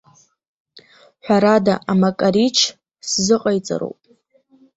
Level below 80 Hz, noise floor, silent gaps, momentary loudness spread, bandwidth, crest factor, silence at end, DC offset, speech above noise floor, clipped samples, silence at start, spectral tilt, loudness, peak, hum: -58 dBFS; -58 dBFS; none; 12 LU; 8.2 kHz; 18 dB; 0.9 s; under 0.1%; 41 dB; under 0.1%; 1.25 s; -4.5 dB/octave; -17 LUFS; -2 dBFS; none